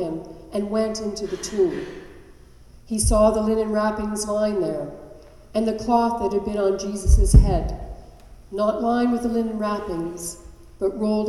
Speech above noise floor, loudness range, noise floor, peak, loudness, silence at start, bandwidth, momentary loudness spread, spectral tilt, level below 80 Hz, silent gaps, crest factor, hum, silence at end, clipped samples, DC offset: 26 dB; 4 LU; -47 dBFS; 0 dBFS; -23 LUFS; 0 s; 13 kHz; 16 LU; -6 dB/octave; -26 dBFS; none; 22 dB; none; 0 s; under 0.1%; under 0.1%